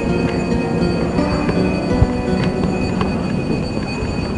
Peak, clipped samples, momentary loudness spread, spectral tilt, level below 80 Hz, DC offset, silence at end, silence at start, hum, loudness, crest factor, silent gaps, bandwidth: 0 dBFS; under 0.1%; 4 LU; -7 dB/octave; -30 dBFS; 0.3%; 0 s; 0 s; none; -19 LUFS; 18 dB; none; 10.5 kHz